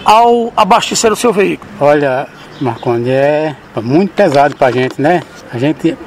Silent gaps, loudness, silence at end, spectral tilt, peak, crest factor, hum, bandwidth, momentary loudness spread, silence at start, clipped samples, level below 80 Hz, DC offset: none; -12 LUFS; 0 s; -5 dB/octave; 0 dBFS; 12 dB; none; 16 kHz; 10 LU; 0 s; 0.2%; -48 dBFS; under 0.1%